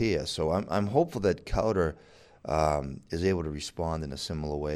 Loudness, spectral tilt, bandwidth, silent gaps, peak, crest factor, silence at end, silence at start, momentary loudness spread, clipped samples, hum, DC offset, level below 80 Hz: -30 LUFS; -6 dB/octave; 14 kHz; none; -10 dBFS; 20 dB; 0 s; 0 s; 7 LU; under 0.1%; none; under 0.1%; -44 dBFS